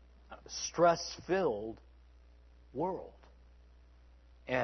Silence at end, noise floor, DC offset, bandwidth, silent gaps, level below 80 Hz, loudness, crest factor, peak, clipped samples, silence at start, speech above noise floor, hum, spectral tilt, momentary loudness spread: 0 s; -60 dBFS; under 0.1%; 6.4 kHz; none; -60 dBFS; -34 LUFS; 22 dB; -14 dBFS; under 0.1%; 0.3 s; 26 dB; none; -3.5 dB/octave; 25 LU